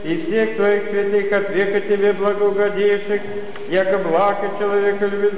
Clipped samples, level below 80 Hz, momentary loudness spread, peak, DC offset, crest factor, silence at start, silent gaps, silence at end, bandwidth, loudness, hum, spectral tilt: under 0.1%; -64 dBFS; 4 LU; -8 dBFS; 4%; 10 dB; 0 s; none; 0 s; 4 kHz; -18 LUFS; none; -9.5 dB/octave